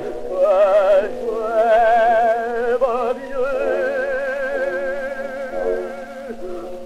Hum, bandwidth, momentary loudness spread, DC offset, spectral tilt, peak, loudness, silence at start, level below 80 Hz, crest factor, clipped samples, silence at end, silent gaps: none; 13 kHz; 15 LU; under 0.1%; -4.5 dB/octave; -6 dBFS; -19 LUFS; 0 s; -46 dBFS; 14 dB; under 0.1%; 0 s; none